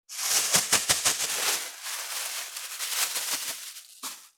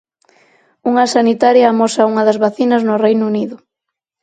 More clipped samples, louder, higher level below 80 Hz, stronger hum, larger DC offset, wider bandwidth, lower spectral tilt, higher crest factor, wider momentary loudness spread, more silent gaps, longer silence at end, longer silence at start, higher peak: neither; second, -26 LUFS vs -13 LUFS; about the same, -68 dBFS vs -64 dBFS; neither; neither; first, over 20 kHz vs 9.2 kHz; second, 1 dB/octave vs -5 dB/octave; first, 24 dB vs 14 dB; first, 16 LU vs 8 LU; neither; second, 0.1 s vs 0.65 s; second, 0.1 s vs 0.85 s; second, -6 dBFS vs 0 dBFS